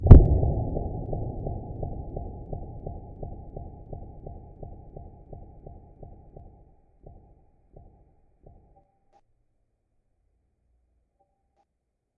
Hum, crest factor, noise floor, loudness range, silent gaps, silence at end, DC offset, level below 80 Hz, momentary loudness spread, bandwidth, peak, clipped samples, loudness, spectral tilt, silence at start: none; 26 dB; -79 dBFS; 21 LU; none; 6.1 s; under 0.1%; -30 dBFS; 23 LU; 2.4 kHz; 0 dBFS; under 0.1%; -25 LUFS; -12.5 dB/octave; 0 s